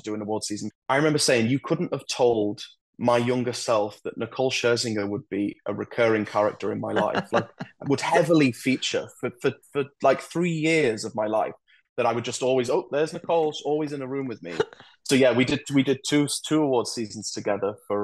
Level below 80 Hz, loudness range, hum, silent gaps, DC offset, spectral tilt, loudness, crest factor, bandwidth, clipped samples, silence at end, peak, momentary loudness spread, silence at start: -66 dBFS; 2 LU; none; 0.75-0.82 s, 2.81-2.93 s, 11.89-11.96 s; under 0.1%; -4.5 dB/octave; -25 LUFS; 20 dB; 12.5 kHz; under 0.1%; 0 s; -4 dBFS; 10 LU; 0.05 s